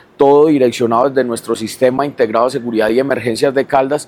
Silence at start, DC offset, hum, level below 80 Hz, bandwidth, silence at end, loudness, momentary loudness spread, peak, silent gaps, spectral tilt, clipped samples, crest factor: 0.2 s; under 0.1%; none; -54 dBFS; 15.5 kHz; 0.05 s; -14 LUFS; 7 LU; 0 dBFS; none; -5.5 dB/octave; under 0.1%; 14 dB